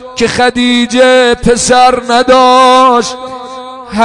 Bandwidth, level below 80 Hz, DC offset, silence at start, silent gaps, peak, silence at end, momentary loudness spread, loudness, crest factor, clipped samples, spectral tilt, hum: 11 kHz; -34 dBFS; 0.5%; 0 s; none; 0 dBFS; 0 s; 18 LU; -7 LUFS; 8 dB; 1%; -3 dB/octave; none